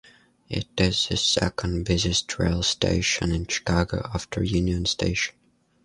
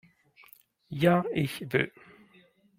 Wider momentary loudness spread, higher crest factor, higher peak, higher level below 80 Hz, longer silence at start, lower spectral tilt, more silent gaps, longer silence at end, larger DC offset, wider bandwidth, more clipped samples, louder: about the same, 8 LU vs 10 LU; about the same, 20 dB vs 22 dB; first, -6 dBFS vs -10 dBFS; first, -36 dBFS vs -66 dBFS; second, 0.5 s vs 0.9 s; second, -4 dB/octave vs -7 dB/octave; neither; second, 0.55 s vs 0.9 s; neither; second, 11.5 kHz vs 16 kHz; neither; first, -24 LUFS vs -28 LUFS